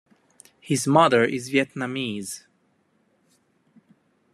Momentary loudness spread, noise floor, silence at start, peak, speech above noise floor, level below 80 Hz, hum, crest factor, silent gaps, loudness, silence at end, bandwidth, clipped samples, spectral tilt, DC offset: 16 LU; -66 dBFS; 0.65 s; -2 dBFS; 45 dB; -70 dBFS; none; 22 dB; none; -22 LUFS; 1.95 s; 14 kHz; under 0.1%; -4.5 dB/octave; under 0.1%